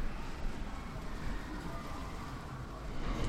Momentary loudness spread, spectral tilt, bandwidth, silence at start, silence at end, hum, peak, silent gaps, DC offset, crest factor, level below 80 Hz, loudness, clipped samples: 2 LU; -5.5 dB/octave; 14.5 kHz; 0 s; 0 s; none; -24 dBFS; none; under 0.1%; 14 dB; -42 dBFS; -44 LUFS; under 0.1%